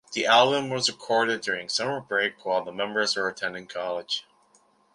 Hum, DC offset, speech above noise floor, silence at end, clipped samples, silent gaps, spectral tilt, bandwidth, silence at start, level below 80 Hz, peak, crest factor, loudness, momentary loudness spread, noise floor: none; under 0.1%; 37 dB; 0.75 s; under 0.1%; none; -2.5 dB/octave; 11.5 kHz; 0.1 s; -72 dBFS; -4 dBFS; 22 dB; -25 LUFS; 12 LU; -63 dBFS